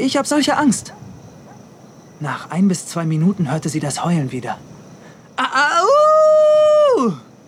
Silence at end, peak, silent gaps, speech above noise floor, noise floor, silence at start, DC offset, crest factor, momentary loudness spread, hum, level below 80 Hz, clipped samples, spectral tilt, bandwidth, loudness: 0.3 s; -4 dBFS; none; 25 dB; -42 dBFS; 0 s; under 0.1%; 12 dB; 15 LU; none; -60 dBFS; under 0.1%; -5 dB/octave; 14 kHz; -16 LUFS